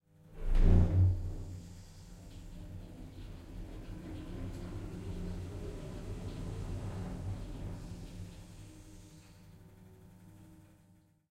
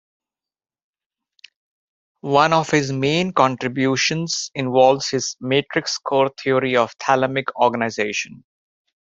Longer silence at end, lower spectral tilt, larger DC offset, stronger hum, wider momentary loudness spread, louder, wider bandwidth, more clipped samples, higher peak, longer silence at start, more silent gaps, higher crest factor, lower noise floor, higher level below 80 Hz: about the same, 0.65 s vs 0.65 s; first, -8 dB/octave vs -4 dB/octave; neither; neither; first, 27 LU vs 7 LU; second, -38 LUFS vs -19 LUFS; first, 9.6 kHz vs 8 kHz; neither; second, -14 dBFS vs -2 dBFS; second, 0.25 s vs 2.25 s; neither; about the same, 22 dB vs 20 dB; about the same, -65 dBFS vs -68 dBFS; first, -38 dBFS vs -62 dBFS